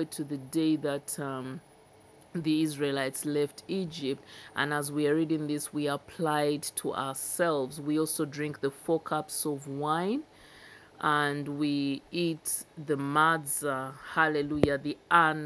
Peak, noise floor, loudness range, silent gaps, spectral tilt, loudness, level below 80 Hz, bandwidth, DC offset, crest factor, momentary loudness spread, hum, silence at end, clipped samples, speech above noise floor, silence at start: -6 dBFS; -57 dBFS; 3 LU; none; -4.5 dB/octave; -30 LUFS; -64 dBFS; 11 kHz; under 0.1%; 24 dB; 8 LU; none; 0 s; under 0.1%; 27 dB; 0 s